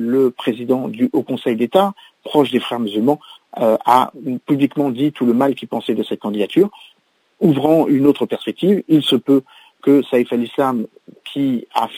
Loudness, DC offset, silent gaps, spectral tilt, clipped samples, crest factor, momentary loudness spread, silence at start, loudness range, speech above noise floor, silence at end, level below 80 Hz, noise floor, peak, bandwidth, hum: -17 LUFS; under 0.1%; none; -7 dB/octave; under 0.1%; 16 dB; 8 LU; 0 s; 3 LU; 43 dB; 0 s; -66 dBFS; -59 dBFS; 0 dBFS; 16 kHz; none